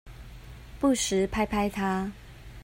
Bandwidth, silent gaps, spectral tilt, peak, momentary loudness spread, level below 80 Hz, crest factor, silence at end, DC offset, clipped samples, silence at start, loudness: 16 kHz; none; -4.5 dB/octave; -14 dBFS; 22 LU; -46 dBFS; 16 dB; 0 s; under 0.1%; under 0.1%; 0.05 s; -28 LUFS